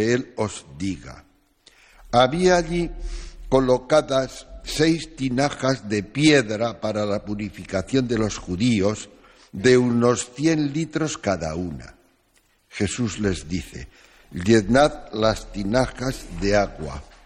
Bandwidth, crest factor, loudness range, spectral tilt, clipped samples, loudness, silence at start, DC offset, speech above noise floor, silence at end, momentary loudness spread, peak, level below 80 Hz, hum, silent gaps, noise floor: 15 kHz; 18 dB; 4 LU; -5 dB/octave; under 0.1%; -22 LUFS; 0 s; under 0.1%; 41 dB; 0.2 s; 16 LU; -4 dBFS; -40 dBFS; none; none; -62 dBFS